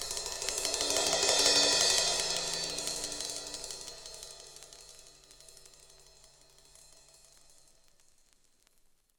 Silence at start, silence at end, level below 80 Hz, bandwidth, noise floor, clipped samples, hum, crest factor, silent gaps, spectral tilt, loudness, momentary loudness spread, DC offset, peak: 0 s; 3.6 s; -60 dBFS; over 20 kHz; -67 dBFS; under 0.1%; none; 26 dB; none; 0.5 dB/octave; -28 LUFS; 25 LU; under 0.1%; -8 dBFS